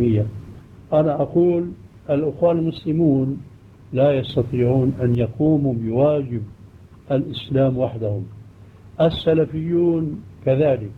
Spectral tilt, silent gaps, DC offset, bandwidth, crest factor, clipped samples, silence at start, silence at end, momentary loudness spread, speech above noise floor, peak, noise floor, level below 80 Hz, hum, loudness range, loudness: -10 dB/octave; none; under 0.1%; 5.2 kHz; 14 dB; under 0.1%; 0 s; 0.05 s; 11 LU; 25 dB; -6 dBFS; -44 dBFS; -46 dBFS; none; 3 LU; -20 LUFS